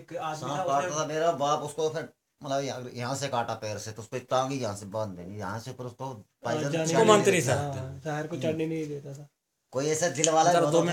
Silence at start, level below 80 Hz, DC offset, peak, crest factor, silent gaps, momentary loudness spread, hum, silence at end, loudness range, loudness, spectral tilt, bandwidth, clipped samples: 0 s; -70 dBFS; under 0.1%; -2 dBFS; 26 dB; none; 16 LU; none; 0 s; 6 LU; -28 LUFS; -4.5 dB/octave; 17 kHz; under 0.1%